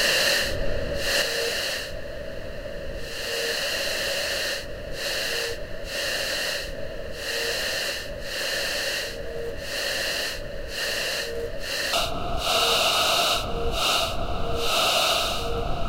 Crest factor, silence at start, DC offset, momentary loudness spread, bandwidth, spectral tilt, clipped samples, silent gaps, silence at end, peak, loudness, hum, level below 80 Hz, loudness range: 16 dB; 0 s; under 0.1%; 14 LU; 16 kHz; -1.5 dB/octave; under 0.1%; none; 0 s; -10 dBFS; -25 LUFS; none; -38 dBFS; 5 LU